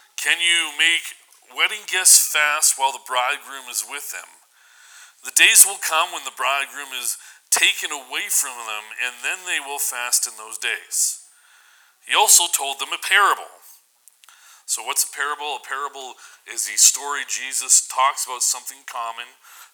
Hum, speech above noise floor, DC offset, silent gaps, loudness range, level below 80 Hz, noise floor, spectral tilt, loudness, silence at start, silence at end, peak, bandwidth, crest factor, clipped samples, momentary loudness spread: none; 34 dB; under 0.1%; none; 6 LU; -84 dBFS; -55 dBFS; 4.5 dB/octave; -18 LUFS; 0.2 s; 0.1 s; 0 dBFS; over 20 kHz; 22 dB; under 0.1%; 18 LU